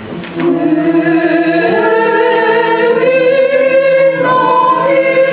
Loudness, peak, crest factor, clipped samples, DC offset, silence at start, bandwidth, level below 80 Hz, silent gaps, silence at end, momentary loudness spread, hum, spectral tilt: -10 LUFS; 0 dBFS; 10 dB; under 0.1%; under 0.1%; 0 s; 4 kHz; -56 dBFS; none; 0 s; 2 LU; none; -9.5 dB/octave